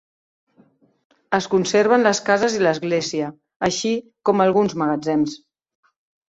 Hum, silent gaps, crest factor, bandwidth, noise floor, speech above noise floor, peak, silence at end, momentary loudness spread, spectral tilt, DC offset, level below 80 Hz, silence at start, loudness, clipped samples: none; 3.56-3.60 s; 18 dB; 8 kHz; -57 dBFS; 38 dB; -2 dBFS; 0.95 s; 9 LU; -4.5 dB/octave; under 0.1%; -62 dBFS; 1.3 s; -20 LUFS; under 0.1%